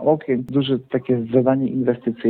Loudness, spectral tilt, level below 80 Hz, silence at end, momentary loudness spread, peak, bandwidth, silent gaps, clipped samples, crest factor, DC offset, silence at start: -20 LUFS; -10 dB/octave; -60 dBFS; 0 s; 4 LU; -4 dBFS; 4.3 kHz; none; under 0.1%; 16 dB; under 0.1%; 0 s